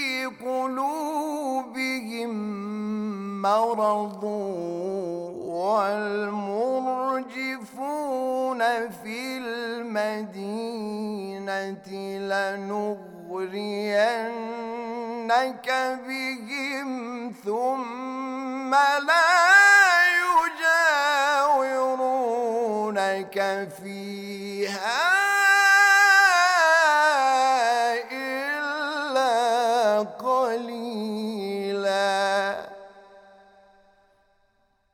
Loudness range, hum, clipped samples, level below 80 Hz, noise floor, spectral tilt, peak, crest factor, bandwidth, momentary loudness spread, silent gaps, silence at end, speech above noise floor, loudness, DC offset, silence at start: 11 LU; none; under 0.1%; -74 dBFS; -67 dBFS; -3 dB/octave; -4 dBFS; 20 dB; 19.5 kHz; 15 LU; none; 1.75 s; 42 dB; -23 LUFS; under 0.1%; 0 s